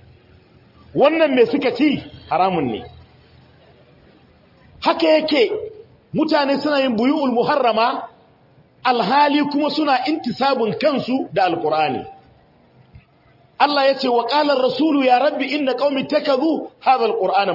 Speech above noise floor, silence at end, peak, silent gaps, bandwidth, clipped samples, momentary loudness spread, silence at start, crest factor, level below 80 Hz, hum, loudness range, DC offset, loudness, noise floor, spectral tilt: 36 dB; 0 s; -2 dBFS; none; 5.8 kHz; under 0.1%; 8 LU; 0.95 s; 16 dB; -60 dBFS; none; 4 LU; under 0.1%; -18 LUFS; -53 dBFS; -6.5 dB/octave